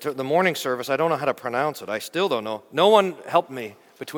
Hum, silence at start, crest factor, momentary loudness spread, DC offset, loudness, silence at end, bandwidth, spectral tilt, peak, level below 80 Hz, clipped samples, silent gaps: none; 0 s; 20 dB; 14 LU; under 0.1%; -22 LUFS; 0 s; 19 kHz; -4.5 dB/octave; -2 dBFS; -72 dBFS; under 0.1%; none